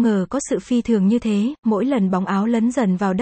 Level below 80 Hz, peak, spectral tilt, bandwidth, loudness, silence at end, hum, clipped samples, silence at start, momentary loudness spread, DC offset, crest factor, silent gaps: -52 dBFS; -6 dBFS; -7 dB/octave; 8.8 kHz; -19 LUFS; 0 s; none; under 0.1%; 0 s; 4 LU; under 0.1%; 12 dB; 1.59-1.63 s